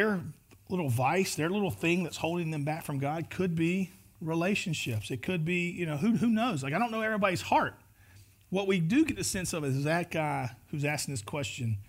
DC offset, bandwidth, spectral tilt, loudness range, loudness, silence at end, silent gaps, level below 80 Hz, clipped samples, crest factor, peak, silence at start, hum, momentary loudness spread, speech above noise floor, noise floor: under 0.1%; 16 kHz; -5.5 dB/octave; 2 LU; -31 LUFS; 0.05 s; none; -60 dBFS; under 0.1%; 18 dB; -12 dBFS; 0 s; none; 8 LU; 27 dB; -57 dBFS